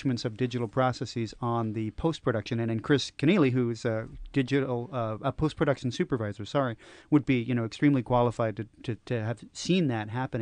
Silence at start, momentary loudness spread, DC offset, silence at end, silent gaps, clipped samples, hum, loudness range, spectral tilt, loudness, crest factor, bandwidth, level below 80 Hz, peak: 0 s; 8 LU; under 0.1%; 0 s; none; under 0.1%; none; 2 LU; -6.5 dB/octave; -29 LUFS; 18 dB; 10 kHz; -52 dBFS; -12 dBFS